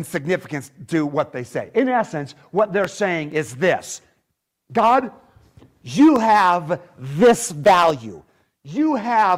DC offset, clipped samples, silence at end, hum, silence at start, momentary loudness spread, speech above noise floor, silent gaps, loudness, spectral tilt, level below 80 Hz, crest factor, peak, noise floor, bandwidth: under 0.1%; under 0.1%; 0 s; none; 0 s; 15 LU; 55 dB; none; -19 LUFS; -5 dB/octave; -58 dBFS; 14 dB; -6 dBFS; -74 dBFS; 16 kHz